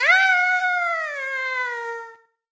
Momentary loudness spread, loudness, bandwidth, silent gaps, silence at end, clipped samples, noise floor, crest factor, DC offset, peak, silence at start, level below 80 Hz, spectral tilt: 15 LU; -20 LUFS; 8 kHz; none; 0.35 s; under 0.1%; -43 dBFS; 16 dB; under 0.1%; -6 dBFS; 0 s; -78 dBFS; 2.5 dB/octave